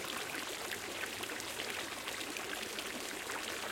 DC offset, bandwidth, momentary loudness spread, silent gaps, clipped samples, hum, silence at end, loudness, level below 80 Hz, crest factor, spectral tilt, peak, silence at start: under 0.1%; 17 kHz; 1 LU; none; under 0.1%; none; 0 s; -40 LUFS; -70 dBFS; 20 dB; -1 dB/octave; -22 dBFS; 0 s